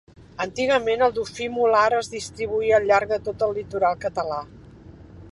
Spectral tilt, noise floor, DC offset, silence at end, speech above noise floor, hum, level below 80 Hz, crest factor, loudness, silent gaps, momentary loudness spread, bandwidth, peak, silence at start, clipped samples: -4 dB/octave; -45 dBFS; under 0.1%; 0 s; 23 dB; none; -52 dBFS; 18 dB; -23 LUFS; none; 12 LU; 11.5 kHz; -4 dBFS; 0.2 s; under 0.1%